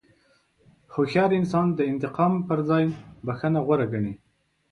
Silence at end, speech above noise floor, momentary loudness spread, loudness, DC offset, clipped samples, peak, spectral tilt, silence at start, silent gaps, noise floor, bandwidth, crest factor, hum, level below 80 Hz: 0.55 s; 40 dB; 11 LU; -25 LUFS; under 0.1%; under 0.1%; -8 dBFS; -8.5 dB/octave; 0.9 s; none; -63 dBFS; 9.8 kHz; 16 dB; none; -58 dBFS